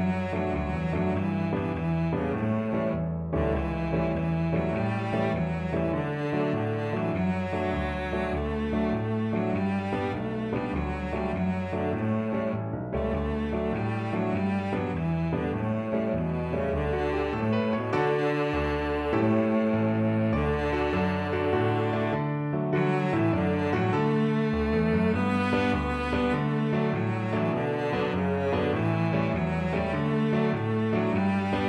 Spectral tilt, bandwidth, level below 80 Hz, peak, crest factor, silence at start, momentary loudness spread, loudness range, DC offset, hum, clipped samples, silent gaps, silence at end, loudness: -8.5 dB/octave; 10.5 kHz; -42 dBFS; -12 dBFS; 14 dB; 0 s; 4 LU; 3 LU; under 0.1%; none; under 0.1%; none; 0 s; -27 LUFS